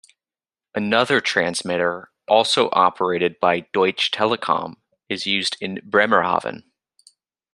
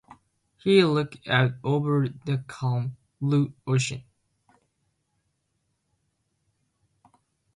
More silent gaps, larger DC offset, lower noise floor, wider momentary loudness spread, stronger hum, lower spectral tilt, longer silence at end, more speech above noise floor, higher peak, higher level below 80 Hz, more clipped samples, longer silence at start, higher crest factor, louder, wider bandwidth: neither; neither; first, under -90 dBFS vs -76 dBFS; about the same, 10 LU vs 11 LU; neither; second, -3.5 dB/octave vs -6 dB/octave; second, 0.95 s vs 3.55 s; first, over 70 dB vs 51 dB; first, -2 dBFS vs -6 dBFS; about the same, -66 dBFS vs -64 dBFS; neither; about the same, 0.75 s vs 0.65 s; about the same, 20 dB vs 22 dB; first, -20 LUFS vs -25 LUFS; about the same, 12.5 kHz vs 11.5 kHz